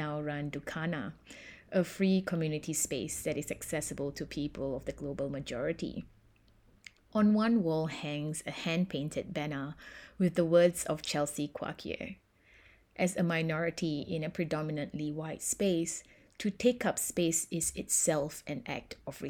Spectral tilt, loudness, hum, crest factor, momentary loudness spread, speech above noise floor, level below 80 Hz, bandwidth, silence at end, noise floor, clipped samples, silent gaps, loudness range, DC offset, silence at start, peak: -4.5 dB/octave; -33 LUFS; none; 20 dB; 12 LU; 31 dB; -60 dBFS; 18.5 kHz; 0 s; -64 dBFS; under 0.1%; none; 4 LU; under 0.1%; 0 s; -14 dBFS